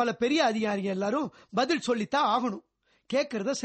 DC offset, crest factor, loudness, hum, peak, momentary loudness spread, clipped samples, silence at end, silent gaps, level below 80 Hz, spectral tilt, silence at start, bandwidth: under 0.1%; 16 dB; -28 LUFS; none; -12 dBFS; 7 LU; under 0.1%; 0 s; none; -70 dBFS; -4.5 dB/octave; 0 s; 8.4 kHz